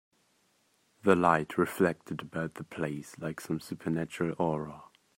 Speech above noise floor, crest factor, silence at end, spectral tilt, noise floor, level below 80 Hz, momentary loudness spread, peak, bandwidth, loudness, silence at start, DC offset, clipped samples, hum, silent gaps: 40 dB; 24 dB; 0.3 s; -6.5 dB/octave; -71 dBFS; -68 dBFS; 14 LU; -8 dBFS; 16 kHz; -31 LUFS; 1.05 s; under 0.1%; under 0.1%; none; none